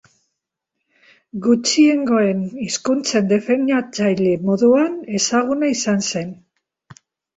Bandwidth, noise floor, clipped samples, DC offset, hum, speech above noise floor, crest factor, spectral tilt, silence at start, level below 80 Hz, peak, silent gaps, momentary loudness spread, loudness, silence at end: 8.2 kHz; -79 dBFS; under 0.1%; under 0.1%; none; 62 dB; 16 dB; -4.5 dB/octave; 1.35 s; -60 dBFS; -4 dBFS; none; 9 LU; -18 LUFS; 1.05 s